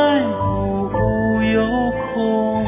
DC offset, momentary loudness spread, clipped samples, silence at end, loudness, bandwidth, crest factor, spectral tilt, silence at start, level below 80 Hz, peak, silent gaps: under 0.1%; 4 LU; under 0.1%; 0 s; -19 LUFS; 3.8 kHz; 12 dB; -11 dB/octave; 0 s; -34 dBFS; -6 dBFS; none